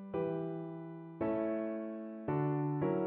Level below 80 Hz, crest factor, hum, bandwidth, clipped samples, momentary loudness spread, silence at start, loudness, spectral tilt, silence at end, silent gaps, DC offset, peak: -72 dBFS; 14 dB; none; 3.9 kHz; under 0.1%; 10 LU; 0 s; -37 LUFS; -9.5 dB/octave; 0 s; none; under 0.1%; -22 dBFS